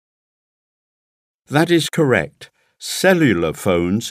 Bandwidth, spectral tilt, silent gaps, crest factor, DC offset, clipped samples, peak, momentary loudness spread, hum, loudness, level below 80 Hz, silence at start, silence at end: 16 kHz; -5 dB/octave; none; 18 dB; under 0.1%; under 0.1%; 0 dBFS; 10 LU; none; -17 LUFS; -50 dBFS; 1.5 s; 0 s